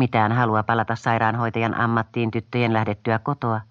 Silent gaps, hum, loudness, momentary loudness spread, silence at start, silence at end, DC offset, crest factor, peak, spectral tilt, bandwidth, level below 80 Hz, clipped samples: none; none; -22 LUFS; 5 LU; 0 s; 0.05 s; under 0.1%; 16 dB; -4 dBFS; -8 dB/octave; 7.4 kHz; -58 dBFS; under 0.1%